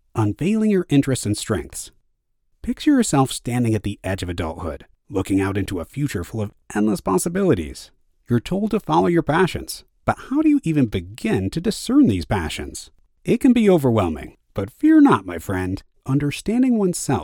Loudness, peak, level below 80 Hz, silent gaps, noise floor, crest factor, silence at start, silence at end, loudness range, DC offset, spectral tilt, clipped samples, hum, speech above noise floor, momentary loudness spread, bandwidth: -20 LUFS; -4 dBFS; -42 dBFS; none; -67 dBFS; 18 dB; 0.15 s; 0 s; 5 LU; under 0.1%; -6 dB/octave; under 0.1%; none; 47 dB; 14 LU; 18 kHz